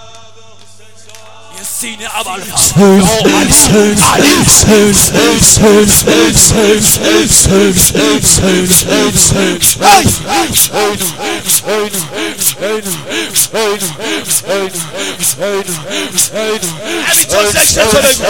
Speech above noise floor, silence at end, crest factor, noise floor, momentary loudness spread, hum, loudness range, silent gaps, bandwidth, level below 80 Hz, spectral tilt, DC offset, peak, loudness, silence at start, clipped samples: 30 dB; 0 s; 10 dB; -40 dBFS; 12 LU; none; 8 LU; none; over 20 kHz; -30 dBFS; -3 dB/octave; 2%; 0 dBFS; -8 LUFS; 0.15 s; 0.8%